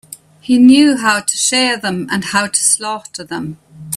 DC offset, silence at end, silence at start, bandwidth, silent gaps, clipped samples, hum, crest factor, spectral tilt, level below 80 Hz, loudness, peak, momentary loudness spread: under 0.1%; 0 s; 0.1 s; 15 kHz; none; under 0.1%; none; 14 dB; -2.5 dB/octave; -56 dBFS; -12 LUFS; 0 dBFS; 17 LU